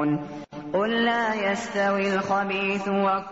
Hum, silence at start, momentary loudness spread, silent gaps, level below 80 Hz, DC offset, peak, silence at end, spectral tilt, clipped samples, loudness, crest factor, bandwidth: none; 0 s; 7 LU; none; -62 dBFS; 0.1%; -12 dBFS; 0 s; -3.5 dB/octave; under 0.1%; -24 LUFS; 12 dB; 8 kHz